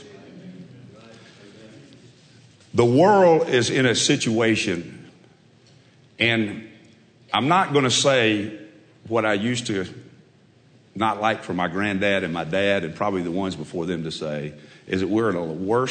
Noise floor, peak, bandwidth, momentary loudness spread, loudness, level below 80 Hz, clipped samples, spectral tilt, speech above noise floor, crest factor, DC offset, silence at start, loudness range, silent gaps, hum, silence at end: -55 dBFS; -6 dBFS; 9.4 kHz; 15 LU; -21 LUFS; -62 dBFS; under 0.1%; -4.5 dB/octave; 34 dB; 18 dB; under 0.1%; 0 s; 6 LU; none; none; 0 s